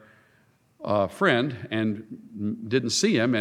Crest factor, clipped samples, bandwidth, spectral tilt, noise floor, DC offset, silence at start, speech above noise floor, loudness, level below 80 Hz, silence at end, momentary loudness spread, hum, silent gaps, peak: 20 dB; under 0.1%; 14.5 kHz; -4.5 dB/octave; -63 dBFS; under 0.1%; 0.8 s; 38 dB; -25 LUFS; -68 dBFS; 0 s; 13 LU; none; none; -6 dBFS